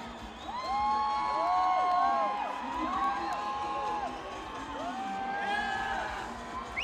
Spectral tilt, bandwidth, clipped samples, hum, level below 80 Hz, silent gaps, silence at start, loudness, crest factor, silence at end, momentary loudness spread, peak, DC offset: -4 dB/octave; 13 kHz; under 0.1%; none; -56 dBFS; none; 0 s; -32 LUFS; 16 dB; 0 s; 12 LU; -16 dBFS; under 0.1%